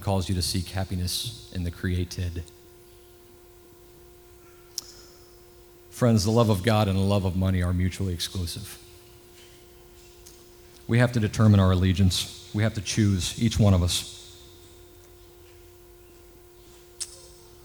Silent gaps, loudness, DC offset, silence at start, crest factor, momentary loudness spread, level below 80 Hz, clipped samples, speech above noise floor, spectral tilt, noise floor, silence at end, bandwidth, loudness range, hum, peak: none; -25 LUFS; under 0.1%; 0 s; 20 dB; 19 LU; -46 dBFS; under 0.1%; 28 dB; -5.5 dB/octave; -51 dBFS; 0.4 s; over 20 kHz; 18 LU; none; -6 dBFS